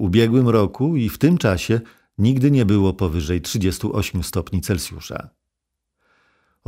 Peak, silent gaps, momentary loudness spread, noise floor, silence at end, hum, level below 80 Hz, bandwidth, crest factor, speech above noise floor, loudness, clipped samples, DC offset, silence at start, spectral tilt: -2 dBFS; none; 9 LU; -80 dBFS; 1.4 s; none; -38 dBFS; 16 kHz; 18 dB; 61 dB; -19 LUFS; under 0.1%; under 0.1%; 0 s; -6.5 dB/octave